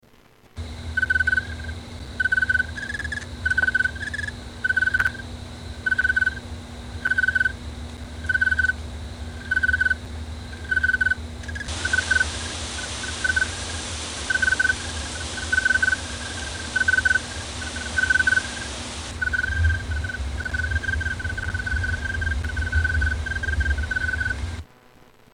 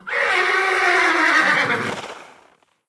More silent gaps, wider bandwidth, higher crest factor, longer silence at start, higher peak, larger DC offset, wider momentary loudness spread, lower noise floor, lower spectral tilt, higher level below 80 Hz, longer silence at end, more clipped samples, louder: neither; about the same, 11 kHz vs 11 kHz; about the same, 16 dB vs 16 dB; first, 0.55 s vs 0.05 s; second, -8 dBFS vs -4 dBFS; neither; first, 15 LU vs 12 LU; about the same, -53 dBFS vs -56 dBFS; about the same, -3 dB/octave vs -2.5 dB/octave; first, -34 dBFS vs -62 dBFS; second, 0.3 s vs 0.6 s; neither; second, -23 LUFS vs -16 LUFS